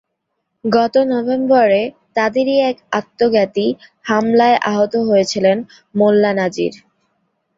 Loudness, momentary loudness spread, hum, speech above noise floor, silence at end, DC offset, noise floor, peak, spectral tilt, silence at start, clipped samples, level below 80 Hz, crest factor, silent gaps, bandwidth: -16 LUFS; 9 LU; none; 58 dB; 0.8 s; under 0.1%; -73 dBFS; -2 dBFS; -5.5 dB/octave; 0.65 s; under 0.1%; -60 dBFS; 14 dB; none; 7.8 kHz